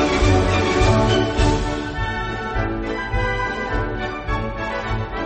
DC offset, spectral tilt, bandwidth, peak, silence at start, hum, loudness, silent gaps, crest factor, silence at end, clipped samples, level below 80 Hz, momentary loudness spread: under 0.1%; -5.5 dB/octave; 8.6 kHz; -4 dBFS; 0 s; none; -21 LUFS; none; 16 dB; 0 s; under 0.1%; -26 dBFS; 8 LU